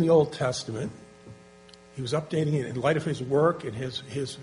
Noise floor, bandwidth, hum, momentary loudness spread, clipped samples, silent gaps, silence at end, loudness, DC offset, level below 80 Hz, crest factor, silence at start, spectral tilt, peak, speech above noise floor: -52 dBFS; 10.5 kHz; none; 13 LU; under 0.1%; none; 0 s; -28 LUFS; under 0.1%; -60 dBFS; 18 dB; 0 s; -6 dB/octave; -10 dBFS; 25 dB